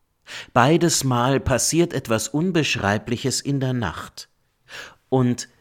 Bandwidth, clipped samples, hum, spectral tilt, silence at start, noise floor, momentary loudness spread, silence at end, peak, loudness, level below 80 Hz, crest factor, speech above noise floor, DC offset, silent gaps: 17 kHz; under 0.1%; none; -4.5 dB/octave; 0.3 s; -42 dBFS; 20 LU; 0.15 s; -2 dBFS; -21 LUFS; -46 dBFS; 20 dB; 22 dB; under 0.1%; none